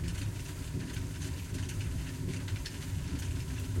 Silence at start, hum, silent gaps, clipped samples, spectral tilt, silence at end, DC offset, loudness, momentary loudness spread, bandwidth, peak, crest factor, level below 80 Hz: 0 s; none; none; under 0.1%; -5 dB/octave; 0 s; under 0.1%; -38 LUFS; 2 LU; 16.5 kHz; -22 dBFS; 14 dB; -44 dBFS